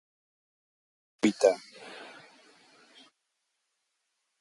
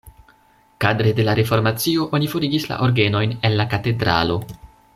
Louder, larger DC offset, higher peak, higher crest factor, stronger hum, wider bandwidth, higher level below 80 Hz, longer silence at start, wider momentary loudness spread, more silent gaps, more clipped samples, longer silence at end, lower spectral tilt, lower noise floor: second, -27 LUFS vs -19 LUFS; neither; second, -8 dBFS vs -2 dBFS; first, 26 dB vs 18 dB; neither; second, 11.5 kHz vs 15.5 kHz; second, -78 dBFS vs -48 dBFS; first, 1.25 s vs 0.05 s; first, 22 LU vs 4 LU; neither; neither; first, 2.35 s vs 0.3 s; second, -4.5 dB/octave vs -6 dB/octave; first, -81 dBFS vs -55 dBFS